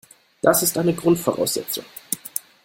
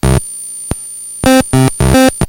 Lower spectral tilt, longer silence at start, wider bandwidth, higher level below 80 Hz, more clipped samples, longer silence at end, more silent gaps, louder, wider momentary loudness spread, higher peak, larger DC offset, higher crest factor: about the same, -4 dB/octave vs -5 dB/octave; first, 0.45 s vs 0.05 s; about the same, 17 kHz vs 17.5 kHz; second, -58 dBFS vs -22 dBFS; second, under 0.1% vs 0.3%; first, 0.25 s vs 0 s; neither; second, -21 LUFS vs -12 LUFS; about the same, 11 LU vs 13 LU; about the same, -2 dBFS vs 0 dBFS; neither; first, 20 dB vs 12 dB